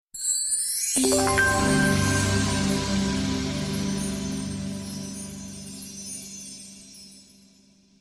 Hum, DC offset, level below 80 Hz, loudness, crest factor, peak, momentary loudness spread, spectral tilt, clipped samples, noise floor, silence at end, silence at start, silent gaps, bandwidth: none; under 0.1%; -42 dBFS; -24 LUFS; 18 dB; -8 dBFS; 17 LU; -3.5 dB/octave; under 0.1%; -58 dBFS; 0.8 s; 0.15 s; none; 14 kHz